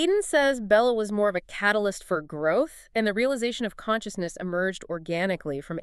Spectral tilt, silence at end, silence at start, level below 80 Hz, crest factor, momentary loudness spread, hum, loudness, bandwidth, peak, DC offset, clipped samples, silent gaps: -4.5 dB/octave; 0 s; 0 s; -56 dBFS; 18 dB; 10 LU; none; -26 LUFS; 13.5 kHz; -8 dBFS; under 0.1%; under 0.1%; none